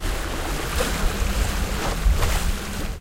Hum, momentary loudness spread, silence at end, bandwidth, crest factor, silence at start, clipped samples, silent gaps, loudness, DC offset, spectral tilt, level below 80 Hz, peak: none; 5 LU; 0 s; 16 kHz; 14 dB; 0 s; under 0.1%; none; -25 LUFS; under 0.1%; -4 dB/octave; -24 dBFS; -8 dBFS